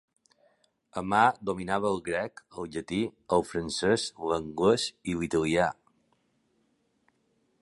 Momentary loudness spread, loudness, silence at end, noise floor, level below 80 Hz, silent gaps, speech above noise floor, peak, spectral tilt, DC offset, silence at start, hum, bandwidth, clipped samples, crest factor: 13 LU; -29 LUFS; 1.9 s; -72 dBFS; -58 dBFS; none; 44 dB; -8 dBFS; -4.5 dB/octave; under 0.1%; 0.95 s; none; 11.5 kHz; under 0.1%; 22 dB